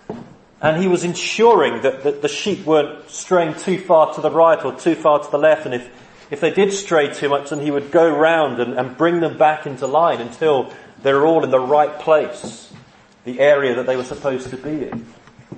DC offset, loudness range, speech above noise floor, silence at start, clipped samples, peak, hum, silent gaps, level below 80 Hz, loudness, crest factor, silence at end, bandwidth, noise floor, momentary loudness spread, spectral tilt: under 0.1%; 2 LU; 21 dB; 0.1 s; under 0.1%; 0 dBFS; none; none; -60 dBFS; -17 LUFS; 16 dB; 0 s; 8.8 kHz; -38 dBFS; 12 LU; -5 dB/octave